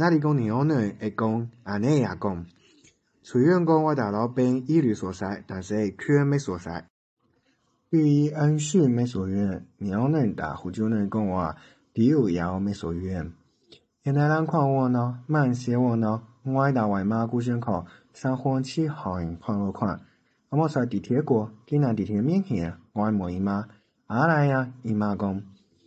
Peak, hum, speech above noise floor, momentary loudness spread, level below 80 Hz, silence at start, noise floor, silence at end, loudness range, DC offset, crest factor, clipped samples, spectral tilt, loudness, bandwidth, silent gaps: -8 dBFS; none; 45 dB; 10 LU; -52 dBFS; 0 s; -69 dBFS; 0.4 s; 3 LU; under 0.1%; 18 dB; under 0.1%; -8 dB/octave; -25 LUFS; 8.8 kHz; 6.90-7.17 s